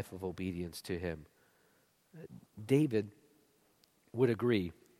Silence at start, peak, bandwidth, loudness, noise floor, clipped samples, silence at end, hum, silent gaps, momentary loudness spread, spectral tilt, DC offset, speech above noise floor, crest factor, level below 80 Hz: 0 s; -16 dBFS; 16 kHz; -35 LUFS; -71 dBFS; under 0.1%; 0.3 s; none; none; 22 LU; -7 dB/octave; under 0.1%; 37 dB; 20 dB; -64 dBFS